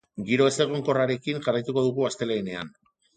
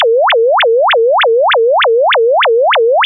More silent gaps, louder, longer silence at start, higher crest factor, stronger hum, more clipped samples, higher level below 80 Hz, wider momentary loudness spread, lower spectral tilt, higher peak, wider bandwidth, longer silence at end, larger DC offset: neither; second, -25 LUFS vs -9 LUFS; first, 0.15 s vs 0 s; first, 18 dB vs 4 dB; neither; neither; first, -64 dBFS vs under -90 dBFS; first, 9 LU vs 0 LU; first, -5 dB/octave vs -2 dB/octave; about the same, -8 dBFS vs -6 dBFS; first, 9.4 kHz vs 4 kHz; first, 0.45 s vs 0 s; neither